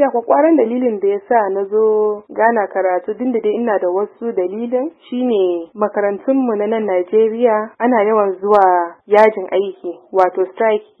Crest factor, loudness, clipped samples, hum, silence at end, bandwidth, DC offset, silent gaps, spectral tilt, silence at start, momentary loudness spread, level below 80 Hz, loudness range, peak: 16 dB; -16 LUFS; under 0.1%; none; 0.15 s; 5.2 kHz; under 0.1%; none; -8 dB/octave; 0 s; 8 LU; -68 dBFS; 4 LU; 0 dBFS